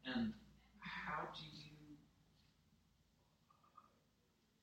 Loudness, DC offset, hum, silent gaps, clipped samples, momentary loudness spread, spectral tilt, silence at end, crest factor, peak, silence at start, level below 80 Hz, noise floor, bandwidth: -48 LUFS; under 0.1%; none; none; under 0.1%; 24 LU; -5.5 dB/octave; 0.75 s; 20 dB; -32 dBFS; 0 s; -74 dBFS; -79 dBFS; 15.5 kHz